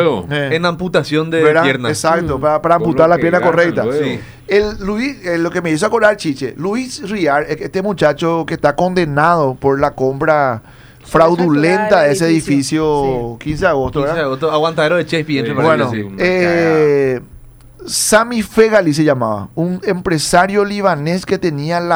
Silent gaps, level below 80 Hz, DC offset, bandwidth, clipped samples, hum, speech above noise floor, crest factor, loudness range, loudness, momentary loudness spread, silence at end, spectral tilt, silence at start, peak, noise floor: none; -40 dBFS; under 0.1%; over 20 kHz; under 0.1%; none; 24 dB; 14 dB; 3 LU; -14 LUFS; 8 LU; 0 s; -5 dB/octave; 0 s; 0 dBFS; -37 dBFS